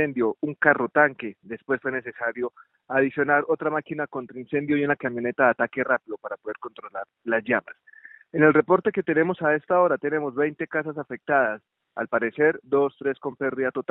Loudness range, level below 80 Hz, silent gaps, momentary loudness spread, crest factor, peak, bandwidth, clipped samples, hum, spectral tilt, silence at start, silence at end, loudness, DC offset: 4 LU; -70 dBFS; none; 13 LU; 22 dB; -2 dBFS; 4 kHz; under 0.1%; none; -5.5 dB/octave; 0 s; 0.1 s; -24 LUFS; under 0.1%